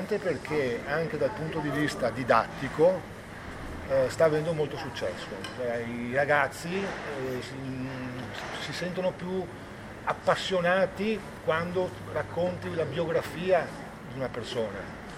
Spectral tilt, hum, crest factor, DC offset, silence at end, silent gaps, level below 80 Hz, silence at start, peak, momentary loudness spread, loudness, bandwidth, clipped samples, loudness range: -5.5 dB/octave; none; 22 dB; under 0.1%; 0 s; none; -54 dBFS; 0 s; -8 dBFS; 12 LU; -30 LUFS; 16 kHz; under 0.1%; 4 LU